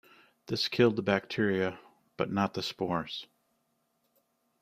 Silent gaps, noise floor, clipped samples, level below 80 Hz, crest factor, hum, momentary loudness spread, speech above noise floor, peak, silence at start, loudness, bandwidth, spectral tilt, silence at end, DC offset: none; -76 dBFS; under 0.1%; -68 dBFS; 22 dB; none; 12 LU; 46 dB; -12 dBFS; 0.5 s; -31 LUFS; 15.5 kHz; -6 dB/octave; 1.4 s; under 0.1%